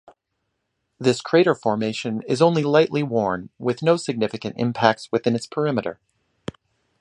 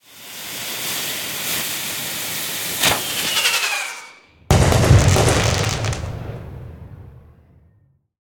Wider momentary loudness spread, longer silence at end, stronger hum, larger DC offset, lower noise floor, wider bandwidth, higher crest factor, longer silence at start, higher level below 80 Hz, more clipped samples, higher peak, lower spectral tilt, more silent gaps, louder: second, 9 LU vs 21 LU; about the same, 1.1 s vs 1 s; neither; neither; first, -76 dBFS vs -58 dBFS; second, 11 kHz vs 18 kHz; about the same, 22 dB vs 20 dB; first, 1 s vs 0.1 s; second, -60 dBFS vs -32 dBFS; neither; about the same, 0 dBFS vs 0 dBFS; first, -6 dB/octave vs -3.5 dB/octave; neither; about the same, -21 LUFS vs -19 LUFS